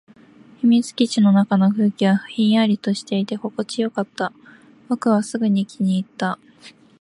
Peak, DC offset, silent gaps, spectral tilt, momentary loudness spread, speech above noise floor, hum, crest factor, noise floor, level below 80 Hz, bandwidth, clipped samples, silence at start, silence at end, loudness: -6 dBFS; under 0.1%; none; -6.5 dB/octave; 10 LU; 29 dB; none; 14 dB; -48 dBFS; -68 dBFS; 11.5 kHz; under 0.1%; 0.65 s; 0.3 s; -20 LUFS